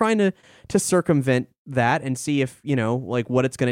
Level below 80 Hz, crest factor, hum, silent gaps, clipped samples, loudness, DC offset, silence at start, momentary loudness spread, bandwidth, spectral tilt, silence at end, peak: -58 dBFS; 16 dB; none; 1.58-1.65 s; under 0.1%; -22 LUFS; under 0.1%; 0 s; 5 LU; 16 kHz; -5.5 dB/octave; 0 s; -6 dBFS